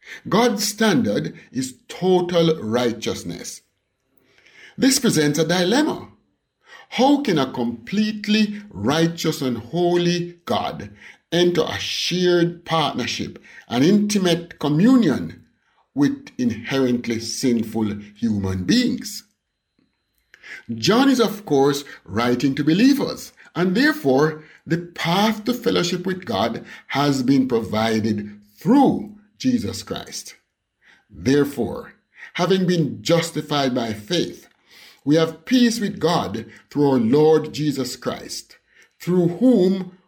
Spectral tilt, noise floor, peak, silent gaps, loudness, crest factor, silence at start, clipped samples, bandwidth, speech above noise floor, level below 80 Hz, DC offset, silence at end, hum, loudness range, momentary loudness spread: -5 dB/octave; -73 dBFS; -6 dBFS; none; -20 LUFS; 14 dB; 0.05 s; under 0.1%; 19 kHz; 53 dB; -58 dBFS; under 0.1%; 0.15 s; none; 4 LU; 13 LU